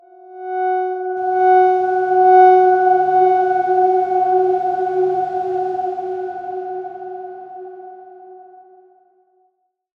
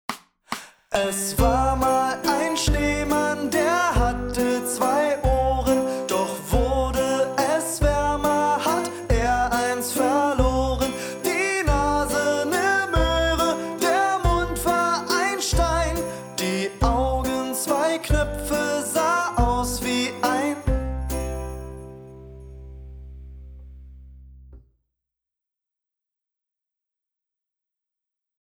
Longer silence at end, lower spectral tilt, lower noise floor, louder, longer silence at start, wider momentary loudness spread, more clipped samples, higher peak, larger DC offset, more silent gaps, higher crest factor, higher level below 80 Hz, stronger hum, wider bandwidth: second, 1.6 s vs 3.85 s; first, -7 dB/octave vs -4.5 dB/octave; second, -66 dBFS vs -87 dBFS; first, -16 LUFS vs -22 LUFS; first, 0.3 s vs 0.1 s; first, 20 LU vs 13 LU; neither; first, -2 dBFS vs -6 dBFS; neither; neither; about the same, 16 dB vs 18 dB; second, -68 dBFS vs -32 dBFS; neither; second, 4.9 kHz vs over 20 kHz